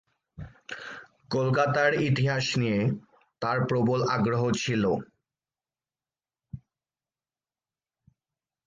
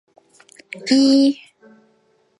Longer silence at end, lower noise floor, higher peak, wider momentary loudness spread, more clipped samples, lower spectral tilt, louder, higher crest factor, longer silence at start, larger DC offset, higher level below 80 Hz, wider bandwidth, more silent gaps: first, 2.1 s vs 1.05 s; first, under -90 dBFS vs -61 dBFS; second, -12 dBFS vs -4 dBFS; about the same, 22 LU vs 20 LU; neither; first, -6 dB/octave vs -3.5 dB/octave; second, -26 LUFS vs -15 LUFS; about the same, 18 dB vs 16 dB; second, 0.4 s vs 0.75 s; neither; first, -60 dBFS vs -76 dBFS; second, 9.4 kHz vs 11.5 kHz; neither